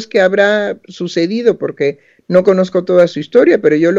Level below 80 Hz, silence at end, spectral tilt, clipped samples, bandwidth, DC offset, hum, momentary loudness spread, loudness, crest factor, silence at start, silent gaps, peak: -62 dBFS; 0 s; -6.5 dB/octave; 0.3%; 7.6 kHz; under 0.1%; none; 8 LU; -13 LUFS; 12 dB; 0 s; none; 0 dBFS